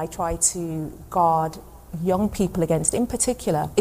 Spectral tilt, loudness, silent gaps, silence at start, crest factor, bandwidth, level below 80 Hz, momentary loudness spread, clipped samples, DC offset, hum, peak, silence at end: -5 dB/octave; -23 LUFS; none; 0 s; 18 dB; 15.5 kHz; -42 dBFS; 9 LU; under 0.1%; under 0.1%; none; -6 dBFS; 0 s